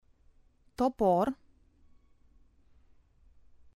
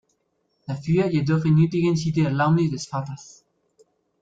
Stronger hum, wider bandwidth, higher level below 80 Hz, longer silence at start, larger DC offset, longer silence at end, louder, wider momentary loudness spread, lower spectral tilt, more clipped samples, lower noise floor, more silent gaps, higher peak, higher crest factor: neither; first, 14 kHz vs 7.8 kHz; about the same, -60 dBFS vs -56 dBFS; about the same, 0.8 s vs 0.7 s; neither; first, 2.4 s vs 1 s; second, -29 LUFS vs -22 LUFS; first, 21 LU vs 15 LU; about the same, -8 dB/octave vs -7.5 dB/octave; neither; second, -63 dBFS vs -71 dBFS; neither; second, -16 dBFS vs -8 dBFS; first, 20 dB vs 14 dB